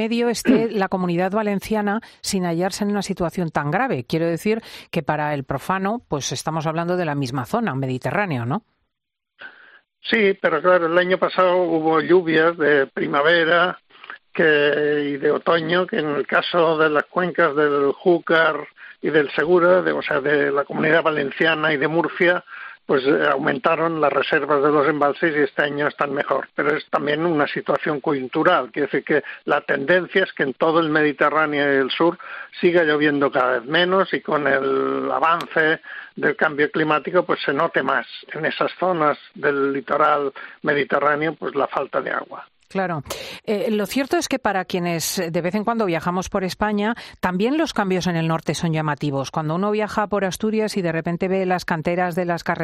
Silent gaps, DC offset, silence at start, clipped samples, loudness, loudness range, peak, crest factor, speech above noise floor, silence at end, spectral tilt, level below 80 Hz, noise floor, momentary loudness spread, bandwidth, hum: none; under 0.1%; 0 s; under 0.1%; -20 LUFS; 5 LU; -4 dBFS; 16 dB; 63 dB; 0 s; -5 dB/octave; -56 dBFS; -83 dBFS; 7 LU; 14 kHz; none